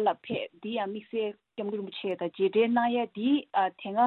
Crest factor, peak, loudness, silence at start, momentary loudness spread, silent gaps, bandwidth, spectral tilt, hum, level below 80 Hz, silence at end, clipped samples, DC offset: 16 dB; -12 dBFS; -30 LUFS; 0 s; 10 LU; none; 4.3 kHz; -8.5 dB/octave; none; -76 dBFS; 0 s; under 0.1%; under 0.1%